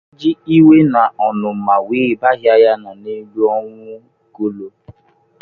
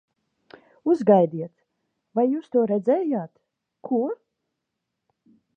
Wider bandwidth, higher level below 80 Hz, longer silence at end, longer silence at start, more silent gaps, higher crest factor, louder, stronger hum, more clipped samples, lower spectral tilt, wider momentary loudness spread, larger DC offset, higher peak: second, 4.7 kHz vs 7.4 kHz; first, -58 dBFS vs -78 dBFS; second, 0.5 s vs 1.45 s; second, 0.2 s vs 0.85 s; neither; second, 14 dB vs 22 dB; first, -14 LUFS vs -23 LUFS; neither; neither; about the same, -9.5 dB/octave vs -9.5 dB/octave; about the same, 19 LU vs 19 LU; neither; first, 0 dBFS vs -4 dBFS